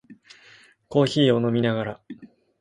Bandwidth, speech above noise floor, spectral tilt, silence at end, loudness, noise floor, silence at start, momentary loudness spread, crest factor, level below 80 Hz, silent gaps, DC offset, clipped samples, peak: 11.5 kHz; 32 dB; -6.5 dB/octave; 0.35 s; -22 LUFS; -53 dBFS; 0.1 s; 23 LU; 18 dB; -62 dBFS; none; under 0.1%; under 0.1%; -6 dBFS